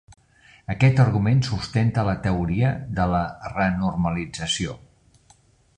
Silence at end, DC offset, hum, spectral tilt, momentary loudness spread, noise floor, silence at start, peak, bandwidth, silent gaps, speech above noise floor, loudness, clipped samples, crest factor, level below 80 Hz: 1 s; under 0.1%; none; -6 dB/octave; 10 LU; -57 dBFS; 0.7 s; -4 dBFS; 9.8 kHz; none; 36 dB; -23 LUFS; under 0.1%; 18 dB; -40 dBFS